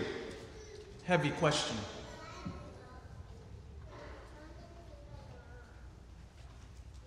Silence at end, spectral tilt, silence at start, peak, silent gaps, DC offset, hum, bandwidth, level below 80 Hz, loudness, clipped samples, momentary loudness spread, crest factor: 0 s; -4.5 dB/octave; 0 s; -16 dBFS; none; under 0.1%; none; 12 kHz; -56 dBFS; -37 LUFS; under 0.1%; 23 LU; 24 dB